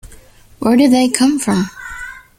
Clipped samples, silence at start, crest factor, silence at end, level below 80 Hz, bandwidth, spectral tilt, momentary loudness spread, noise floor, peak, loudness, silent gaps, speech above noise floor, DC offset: under 0.1%; 0.05 s; 16 dB; 0.2 s; -44 dBFS; 17 kHz; -4.5 dB/octave; 17 LU; -42 dBFS; 0 dBFS; -14 LUFS; none; 30 dB; under 0.1%